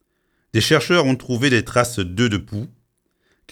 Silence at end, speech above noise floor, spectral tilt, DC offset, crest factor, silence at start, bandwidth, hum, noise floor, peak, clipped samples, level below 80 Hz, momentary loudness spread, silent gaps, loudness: 0.85 s; 50 dB; -5 dB/octave; under 0.1%; 20 dB; 0.55 s; 18 kHz; none; -68 dBFS; -2 dBFS; under 0.1%; -50 dBFS; 13 LU; none; -18 LUFS